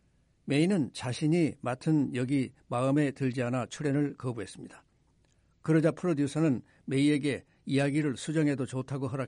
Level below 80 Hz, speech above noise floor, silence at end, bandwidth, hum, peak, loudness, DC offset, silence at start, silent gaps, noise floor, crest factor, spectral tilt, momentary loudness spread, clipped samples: -68 dBFS; 39 dB; 0 s; 11.5 kHz; none; -14 dBFS; -30 LUFS; under 0.1%; 0.45 s; none; -68 dBFS; 16 dB; -6.5 dB/octave; 10 LU; under 0.1%